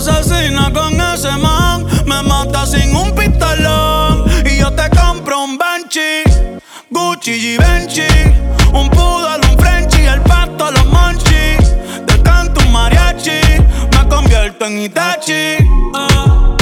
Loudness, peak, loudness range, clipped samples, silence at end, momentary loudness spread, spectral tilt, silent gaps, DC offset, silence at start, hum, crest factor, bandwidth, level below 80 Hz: -11 LUFS; 0 dBFS; 2 LU; under 0.1%; 0 s; 5 LU; -4.5 dB/octave; none; under 0.1%; 0 s; none; 10 dB; 16.5 kHz; -12 dBFS